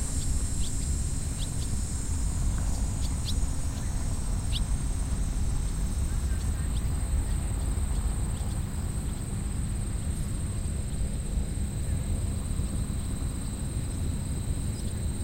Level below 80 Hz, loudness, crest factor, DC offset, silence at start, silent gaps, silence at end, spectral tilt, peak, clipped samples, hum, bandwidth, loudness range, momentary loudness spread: -30 dBFS; -32 LUFS; 14 dB; under 0.1%; 0 s; none; 0 s; -5 dB/octave; -16 dBFS; under 0.1%; none; 16.5 kHz; 1 LU; 2 LU